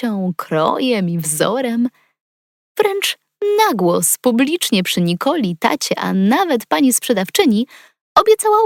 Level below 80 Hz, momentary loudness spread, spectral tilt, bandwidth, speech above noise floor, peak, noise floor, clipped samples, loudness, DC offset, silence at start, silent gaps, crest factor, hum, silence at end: -60 dBFS; 6 LU; -4 dB/octave; 17 kHz; over 74 dB; 0 dBFS; under -90 dBFS; under 0.1%; -16 LUFS; under 0.1%; 0 s; 2.20-2.75 s, 8.01-8.15 s; 16 dB; none; 0 s